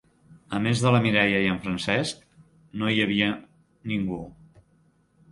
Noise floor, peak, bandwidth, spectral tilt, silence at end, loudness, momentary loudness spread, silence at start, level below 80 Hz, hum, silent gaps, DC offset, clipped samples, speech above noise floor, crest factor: -63 dBFS; -6 dBFS; 11.5 kHz; -5.5 dB/octave; 1 s; -24 LUFS; 17 LU; 0.5 s; -56 dBFS; none; none; under 0.1%; under 0.1%; 39 dB; 20 dB